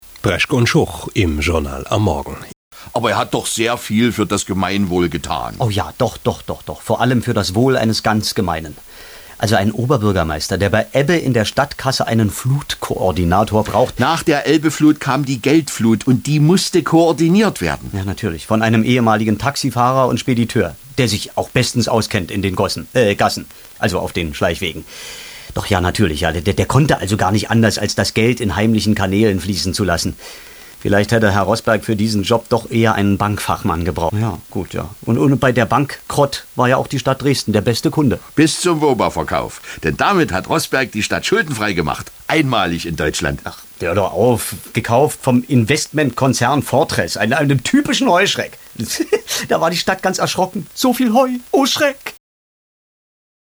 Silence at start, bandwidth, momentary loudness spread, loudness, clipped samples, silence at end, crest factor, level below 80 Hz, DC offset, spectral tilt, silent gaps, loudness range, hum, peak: 0.05 s; over 20 kHz; 8 LU; -16 LUFS; under 0.1%; 1.35 s; 16 dB; -38 dBFS; under 0.1%; -5 dB/octave; 2.56-2.71 s; 3 LU; none; 0 dBFS